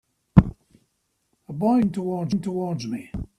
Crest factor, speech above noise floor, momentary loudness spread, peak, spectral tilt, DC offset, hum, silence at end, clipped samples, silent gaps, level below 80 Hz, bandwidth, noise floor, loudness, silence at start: 24 dB; 49 dB; 13 LU; 0 dBFS; -8.5 dB/octave; under 0.1%; none; 0.15 s; under 0.1%; none; -38 dBFS; 11 kHz; -72 dBFS; -23 LUFS; 0.35 s